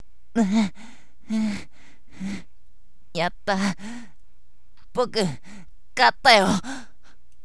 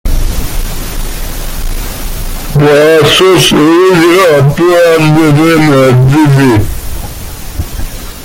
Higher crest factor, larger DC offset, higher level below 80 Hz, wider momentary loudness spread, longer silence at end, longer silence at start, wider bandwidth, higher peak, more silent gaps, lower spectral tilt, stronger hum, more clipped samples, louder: first, 24 dB vs 8 dB; first, 2% vs under 0.1%; second, -52 dBFS vs -18 dBFS; first, 21 LU vs 16 LU; first, 0.6 s vs 0 s; first, 0.35 s vs 0.05 s; second, 11 kHz vs 17.5 kHz; about the same, -2 dBFS vs 0 dBFS; neither; about the same, -4.5 dB/octave vs -5.5 dB/octave; neither; neither; second, -22 LUFS vs -6 LUFS